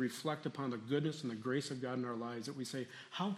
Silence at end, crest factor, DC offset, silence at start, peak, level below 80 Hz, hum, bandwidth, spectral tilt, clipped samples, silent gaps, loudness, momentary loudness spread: 0 s; 18 dB; under 0.1%; 0 s; -22 dBFS; -84 dBFS; none; 14 kHz; -5.5 dB/octave; under 0.1%; none; -41 LUFS; 6 LU